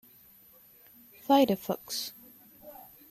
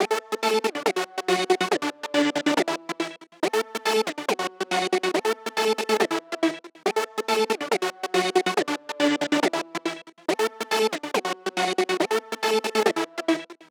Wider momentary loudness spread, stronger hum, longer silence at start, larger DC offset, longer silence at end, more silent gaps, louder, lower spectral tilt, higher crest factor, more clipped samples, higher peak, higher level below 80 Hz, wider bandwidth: first, 26 LU vs 6 LU; neither; first, 1.3 s vs 0 s; neither; first, 0.4 s vs 0.15 s; neither; second, -28 LUFS vs -25 LUFS; first, -4.5 dB/octave vs -3 dB/octave; about the same, 20 dB vs 20 dB; neither; second, -12 dBFS vs -6 dBFS; first, -72 dBFS vs -86 dBFS; second, 15.5 kHz vs over 20 kHz